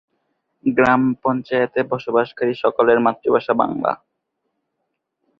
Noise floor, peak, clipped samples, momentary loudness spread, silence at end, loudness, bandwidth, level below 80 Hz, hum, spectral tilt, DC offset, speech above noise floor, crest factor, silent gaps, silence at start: -76 dBFS; -2 dBFS; under 0.1%; 7 LU; 1.45 s; -19 LUFS; 7 kHz; -58 dBFS; none; -8 dB/octave; under 0.1%; 58 dB; 18 dB; none; 0.65 s